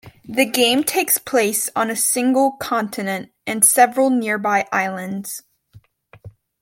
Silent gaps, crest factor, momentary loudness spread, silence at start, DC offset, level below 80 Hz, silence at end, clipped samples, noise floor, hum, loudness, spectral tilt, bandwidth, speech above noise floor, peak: none; 20 dB; 13 LU; 0.05 s; under 0.1%; -62 dBFS; 0.35 s; under 0.1%; -50 dBFS; none; -18 LUFS; -2 dB/octave; 17 kHz; 32 dB; 0 dBFS